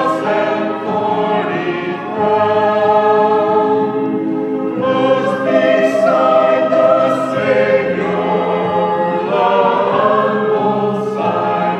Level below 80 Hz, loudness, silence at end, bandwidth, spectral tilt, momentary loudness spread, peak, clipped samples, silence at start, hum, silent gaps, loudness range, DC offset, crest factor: -58 dBFS; -14 LUFS; 0 s; 9.4 kHz; -7 dB/octave; 6 LU; 0 dBFS; under 0.1%; 0 s; none; none; 2 LU; under 0.1%; 14 dB